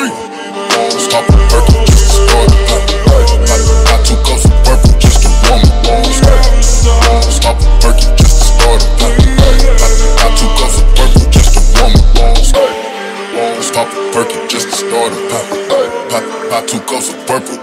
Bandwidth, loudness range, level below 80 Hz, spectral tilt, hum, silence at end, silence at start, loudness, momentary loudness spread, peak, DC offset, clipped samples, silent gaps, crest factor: 15.5 kHz; 6 LU; -8 dBFS; -4.5 dB/octave; none; 0 s; 0 s; -10 LUFS; 8 LU; 0 dBFS; under 0.1%; 0.4%; none; 6 dB